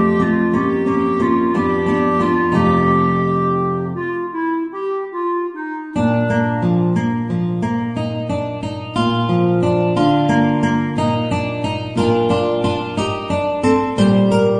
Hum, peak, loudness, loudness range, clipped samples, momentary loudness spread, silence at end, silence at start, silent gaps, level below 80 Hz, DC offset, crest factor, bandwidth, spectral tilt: none; -2 dBFS; -18 LUFS; 3 LU; under 0.1%; 8 LU; 0 s; 0 s; none; -46 dBFS; under 0.1%; 14 dB; 10 kHz; -7.5 dB/octave